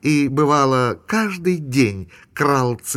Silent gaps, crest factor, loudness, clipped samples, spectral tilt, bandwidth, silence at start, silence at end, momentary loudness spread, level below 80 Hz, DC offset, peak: none; 14 dB; -18 LUFS; under 0.1%; -5.5 dB/octave; 15.5 kHz; 0.05 s; 0 s; 6 LU; -50 dBFS; under 0.1%; -4 dBFS